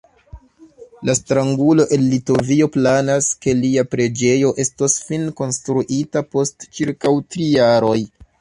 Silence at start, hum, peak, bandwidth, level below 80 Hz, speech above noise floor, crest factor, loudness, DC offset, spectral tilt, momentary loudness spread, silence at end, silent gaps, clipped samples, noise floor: 0.35 s; none; -2 dBFS; 11.5 kHz; -50 dBFS; 27 dB; 14 dB; -17 LUFS; under 0.1%; -5 dB/octave; 8 LU; 0.35 s; none; under 0.1%; -44 dBFS